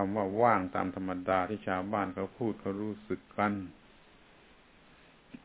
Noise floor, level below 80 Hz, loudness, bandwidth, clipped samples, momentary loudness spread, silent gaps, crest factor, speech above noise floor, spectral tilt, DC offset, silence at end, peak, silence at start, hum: -60 dBFS; -60 dBFS; -33 LUFS; 4 kHz; under 0.1%; 12 LU; none; 22 dB; 27 dB; -6 dB/octave; under 0.1%; 0.1 s; -12 dBFS; 0 s; none